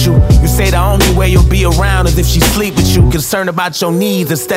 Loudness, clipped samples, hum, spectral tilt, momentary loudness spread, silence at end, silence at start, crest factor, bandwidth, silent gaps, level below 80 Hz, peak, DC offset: -11 LUFS; under 0.1%; none; -5 dB/octave; 5 LU; 0 s; 0 s; 10 dB; 16.5 kHz; none; -14 dBFS; 0 dBFS; under 0.1%